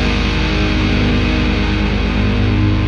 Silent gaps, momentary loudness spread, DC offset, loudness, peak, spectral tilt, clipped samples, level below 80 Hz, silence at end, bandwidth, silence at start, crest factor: none; 2 LU; under 0.1%; -16 LUFS; -4 dBFS; -6.5 dB/octave; under 0.1%; -18 dBFS; 0 s; 7.2 kHz; 0 s; 10 dB